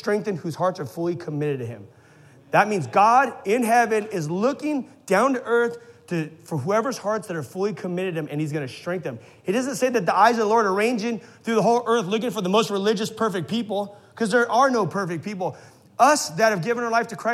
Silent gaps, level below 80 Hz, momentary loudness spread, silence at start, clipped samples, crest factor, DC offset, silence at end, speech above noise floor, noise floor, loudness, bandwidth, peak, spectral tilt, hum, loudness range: none; -74 dBFS; 11 LU; 0.05 s; under 0.1%; 20 dB; under 0.1%; 0 s; 28 dB; -51 dBFS; -23 LUFS; 15 kHz; -2 dBFS; -5 dB/octave; none; 5 LU